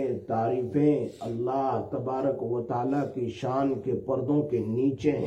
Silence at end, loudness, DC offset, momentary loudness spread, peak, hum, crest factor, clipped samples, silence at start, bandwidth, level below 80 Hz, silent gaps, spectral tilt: 0 s; -28 LUFS; under 0.1%; 6 LU; -12 dBFS; none; 14 dB; under 0.1%; 0 s; 8.6 kHz; -62 dBFS; none; -9 dB/octave